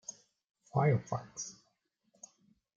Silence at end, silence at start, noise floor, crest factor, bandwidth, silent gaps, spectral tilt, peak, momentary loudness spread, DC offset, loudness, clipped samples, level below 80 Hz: 1.25 s; 0.1 s; -78 dBFS; 22 dB; 7.6 kHz; 0.51-0.55 s; -6 dB/octave; -16 dBFS; 25 LU; under 0.1%; -35 LUFS; under 0.1%; -76 dBFS